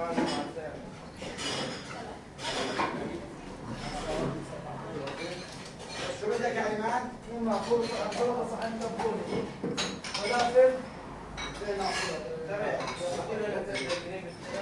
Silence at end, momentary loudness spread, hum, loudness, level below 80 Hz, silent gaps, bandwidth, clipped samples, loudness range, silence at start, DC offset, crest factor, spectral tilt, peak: 0 s; 12 LU; none; -32 LUFS; -54 dBFS; none; 11.5 kHz; under 0.1%; 6 LU; 0 s; under 0.1%; 20 dB; -4 dB/octave; -12 dBFS